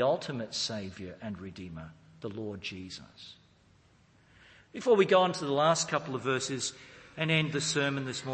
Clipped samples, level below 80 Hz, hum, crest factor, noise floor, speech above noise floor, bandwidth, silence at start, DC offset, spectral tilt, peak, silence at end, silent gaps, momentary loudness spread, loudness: under 0.1%; -66 dBFS; none; 20 dB; -63 dBFS; 32 dB; 8.8 kHz; 0 s; under 0.1%; -4 dB/octave; -12 dBFS; 0 s; none; 21 LU; -30 LUFS